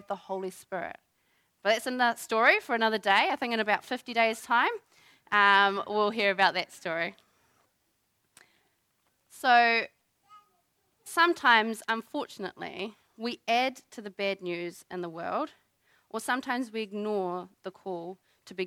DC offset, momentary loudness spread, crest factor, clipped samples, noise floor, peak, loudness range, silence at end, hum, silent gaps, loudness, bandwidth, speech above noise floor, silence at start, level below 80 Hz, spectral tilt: under 0.1%; 16 LU; 22 dB; under 0.1%; -75 dBFS; -8 dBFS; 8 LU; 0 s; none; none; -28 LUFS; 16 kHz; 47 dB; 0.1 s; -80 dBFS; -3 dB/octave